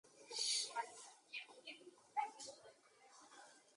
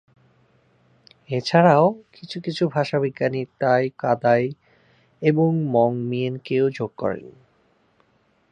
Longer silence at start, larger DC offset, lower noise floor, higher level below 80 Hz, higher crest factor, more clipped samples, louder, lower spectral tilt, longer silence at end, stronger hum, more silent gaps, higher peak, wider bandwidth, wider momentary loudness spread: second, 0.05 s vs 1.3 s; neither; first, -68 dBFS vs -63 dBFS; second, under -90 dBFS vs -66 dBFS; about the same, 22 dB vs 20 dB; neither; second, -45 LUFS vs -21 LUFS; second, 2 dB/octave vs -7.5 dB/octave; second, 0.05 s vs 1.2 s; neither; neither; second, -28 dBFS vs -2 dBFS; first, 11 kHz vs 9.2 kHz; first, 24 LU vs 12 LU